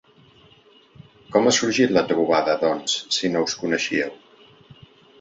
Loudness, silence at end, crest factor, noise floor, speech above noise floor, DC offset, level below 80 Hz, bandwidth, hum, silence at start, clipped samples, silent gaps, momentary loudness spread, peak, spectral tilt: -21 LUFS; 1.05 s; 20 dB; -53 dBFS; 33 dB; under 0.1%; -62 dBFS; 8.4 kHz; none; 1.3 s; under 0.1%; none; 6 LU; -4 dBFS; -3 dB/octave